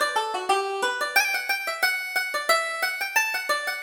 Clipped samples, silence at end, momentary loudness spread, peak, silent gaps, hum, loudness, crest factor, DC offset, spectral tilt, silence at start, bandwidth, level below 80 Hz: under 0.1%; 0 s; 4 LU; -8 dBFS; none; none; -24 LUFS; 18 dB; under 0.1%; 1.5 dB/octave; 0 s; over 20 kHz; -70 dBFS